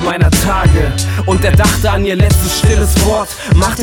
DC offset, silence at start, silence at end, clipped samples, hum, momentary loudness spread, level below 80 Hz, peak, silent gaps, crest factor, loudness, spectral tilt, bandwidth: under 0.1%; 0 s; 0 s; under 0.1%; none; 4 LU; -16 dBFS; 0 dBFS; none; 10 dB; -12 LUFS; -5 dB/octave; 18 kHz